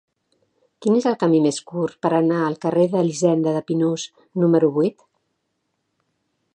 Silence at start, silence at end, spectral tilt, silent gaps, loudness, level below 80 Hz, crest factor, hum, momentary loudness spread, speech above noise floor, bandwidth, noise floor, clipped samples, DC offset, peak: 0.8 s; 1.65 s; -6.5 dB/octave; none; -20 LUFS; -72 dBFS; 16 dB; none; 8 LU; 55 dB; 10 kHz; -74 dBFS; under 0.1%; under 0.1%; -4 dBFS